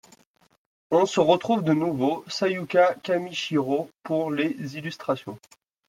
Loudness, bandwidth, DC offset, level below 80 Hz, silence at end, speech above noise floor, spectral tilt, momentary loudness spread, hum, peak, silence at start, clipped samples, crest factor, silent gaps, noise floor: -25 LUFS; 15.5 kHz; under 0.1%; -70 dBFS; 0.5 s; 35 dB; -5.5 dB/octave; 11 LU; none; -6 dBFS; 0.9 s; under 0.1%; 20 dB; none; -59 dBFS